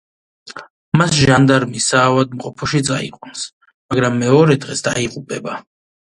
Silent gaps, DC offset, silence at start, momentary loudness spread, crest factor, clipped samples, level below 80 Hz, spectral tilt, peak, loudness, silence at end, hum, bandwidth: 0.70-0.92 s, 3.53-3.61 s, 3.74-3.89 s; under 0.1%; 0.45 s; 17 LU; 16 dB; under 0.1%; -46 dBFS; -5 dB/octave; 0 dBFS; -15 LUFS; 0.45 s; none; 11.5 kHz